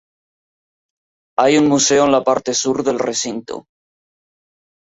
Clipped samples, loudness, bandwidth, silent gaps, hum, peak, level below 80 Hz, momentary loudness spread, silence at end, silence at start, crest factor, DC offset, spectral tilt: under 0.1%; -16 LUFS; 8 kHz; none; none; -2 dBFS; -58 dBFS; 13 LU; 1.25 s; 1.4 s; 18 dB; under 0.1%; -3 dB/octave